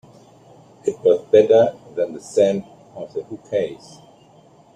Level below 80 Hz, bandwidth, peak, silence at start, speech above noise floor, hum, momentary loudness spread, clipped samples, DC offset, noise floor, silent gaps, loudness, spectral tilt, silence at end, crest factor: -64 dBFS; 10 kHz; -2 dBFS; 0.85 s; 32 dB; none; 17 LU; under 0.1%; under 0.1%; -50 dBFS; none; -19 LUFS; -6 dB/octave; 1 s; 18 dB